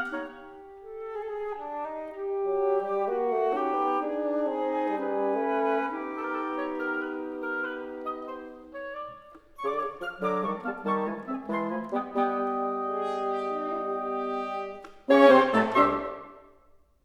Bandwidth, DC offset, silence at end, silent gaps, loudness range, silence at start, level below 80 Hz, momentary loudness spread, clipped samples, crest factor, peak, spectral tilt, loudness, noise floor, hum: 12 kHz; under 0.1%; 0.65 s; none; 9 LU; 0 s; -64 dBFS; 15 LU; under 0.1%; 22 dB; -6 dBFS; -6.5 dB/octave; -28 LUFS; -59 dBFS; none